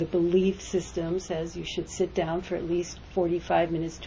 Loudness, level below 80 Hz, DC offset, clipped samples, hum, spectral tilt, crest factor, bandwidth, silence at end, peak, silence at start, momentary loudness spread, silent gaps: -28 LUFS; -48 dBFS; under 0.1%; under 0.1%; none; -6 dB/octave; 16 dB; 7.8 kHz; 0 s; -12 dBFS; 0 s; 8 LU; none